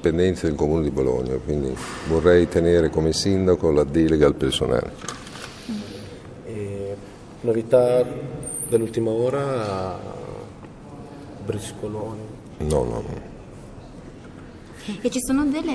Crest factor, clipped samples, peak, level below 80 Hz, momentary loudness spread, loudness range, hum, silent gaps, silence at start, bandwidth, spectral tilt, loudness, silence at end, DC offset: 20 dB; under 0.1%; -4 dBFS; -40 dBFS; 22 LU; 11 LU; none; none; 0 s; 11 kHz; -6 dB/octave; -22 LUFS; 0 s; under 0.1%